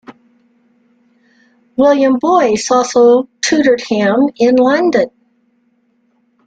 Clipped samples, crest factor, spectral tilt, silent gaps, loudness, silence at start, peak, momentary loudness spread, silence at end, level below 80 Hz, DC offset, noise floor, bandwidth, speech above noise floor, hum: under 0.1%; 12 dB; -4 dB/octave; none; -12 LUFS; 0.1 s; 0 dBFS; 5 LU; 1.4 s; -56 dBFS; under 0.1%; -58 dBFS; 9.2 kHz; 48 dB; none